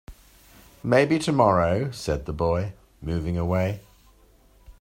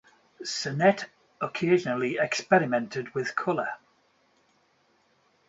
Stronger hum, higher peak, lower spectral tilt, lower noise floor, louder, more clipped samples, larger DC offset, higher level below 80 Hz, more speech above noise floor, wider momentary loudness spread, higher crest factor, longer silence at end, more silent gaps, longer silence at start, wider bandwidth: neither; first, -4 dBFS vs -8 dBFS; first, -6.5 dB/octave vs -5 dB/octave; second, -56 dBFS vs -67 dBFS; first, -24 LUFS vs -27 LUFS; neither; neither; first, -44 dBFS vs -72 dBFS; second, 33 dB vs 41 dB; first, 15 LU vs 12 LU; about the same, 22 dB vs 22 dB; second, 0.1 s vs 1.75 s; neither; second, 0.1 s vs 0.4 s; first, 16 kHz vs 8 kHz